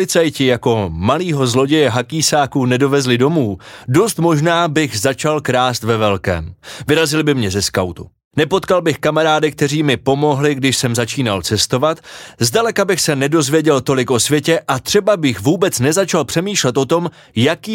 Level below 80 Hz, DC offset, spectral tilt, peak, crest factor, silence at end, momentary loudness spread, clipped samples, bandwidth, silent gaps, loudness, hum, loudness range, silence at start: -46 dBFS; under 0.1%; -4.5 dB/octave; 0 dBFS; 14 dB; 0 s; 5 LU; under 0.1%; 17 kHz; 8.24-8.31 s; -15 LUFS; none; 2 LU; 0 s